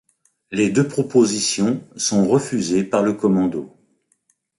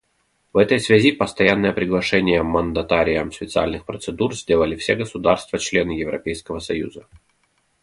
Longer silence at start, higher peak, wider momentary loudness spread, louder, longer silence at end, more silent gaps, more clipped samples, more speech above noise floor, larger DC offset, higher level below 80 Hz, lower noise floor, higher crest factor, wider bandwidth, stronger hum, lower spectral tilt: about the same, 0.5 s vs 0.55 s; second, -4 dBFS vs 0 dBFS; second, 6 LU vs 11 LU; about the same, -19 LUFS vs -20 LUFS; about the same, 0.9 s vs 0.85 s; neither; neither; about the same, 47 dB vs 47 dB; neither; second, -58 dBFS vs -42 dBFS; about the same, -66 dBFS vs -67 dBFS; about the same, 16 dB vs 20 dB; about the same, 11.5 kHz vs 11.5 kHz; neither; about the same, -5 dB/octave vs -5 dB/octave